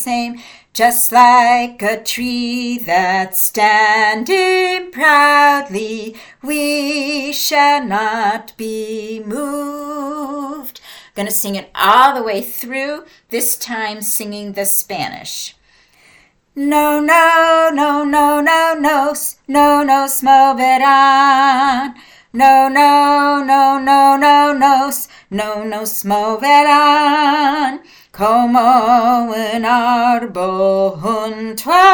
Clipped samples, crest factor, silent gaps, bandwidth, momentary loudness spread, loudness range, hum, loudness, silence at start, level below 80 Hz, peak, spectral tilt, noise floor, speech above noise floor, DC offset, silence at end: under 0.1%; 14 dB; none; 19.5 kHz; 15 LU; 8 LU; none; -13 LUFS; 0 s; -54 dBFS; 0 dBFS; -2.5 dB/octave; -51 dBFS; 38 dB; under 0.1%; 0 s